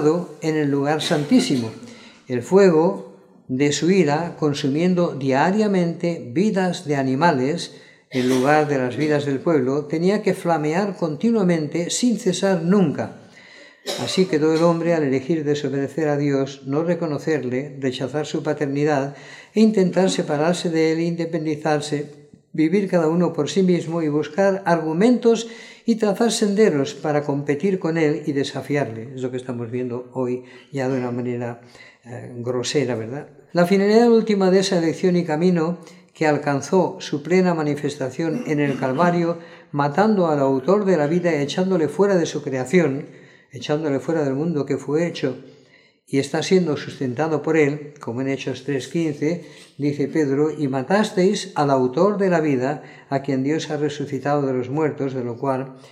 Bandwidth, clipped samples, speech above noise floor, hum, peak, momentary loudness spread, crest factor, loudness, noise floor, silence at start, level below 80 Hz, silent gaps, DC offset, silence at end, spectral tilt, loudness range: 13.5 kHz; under 0.1%; 34 dB; none; -2 dBFS; 10 LU; 18 dB; -21 LUFS; -54 dBFS; 0 s; -70 dBFS; none; under 0.1%; 0.05 s; -6 dB/octave; 4 LU